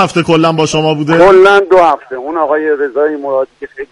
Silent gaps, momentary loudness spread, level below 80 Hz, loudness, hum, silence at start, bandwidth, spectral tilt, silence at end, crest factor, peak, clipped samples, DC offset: none; 12 LU; -44 dBFS; -10 LUFS; none; 0 s; 11.5 kHz; -5.5 dB/octave; 0.05 s; 10 dB; 0 dBFS; 0.3%; under 0.1%